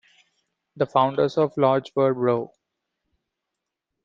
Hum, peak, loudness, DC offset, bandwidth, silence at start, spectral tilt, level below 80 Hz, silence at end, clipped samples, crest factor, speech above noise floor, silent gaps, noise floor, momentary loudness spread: none; -4 dBFS; -22 LUFS; under 0.1%; 7.6 kHz; 0.75 s; -8 dB/octave; -68 dBFS; 1.6 s; under 0.1%; 20 dB; 63 dB; none; -84 dBFS; 7 LU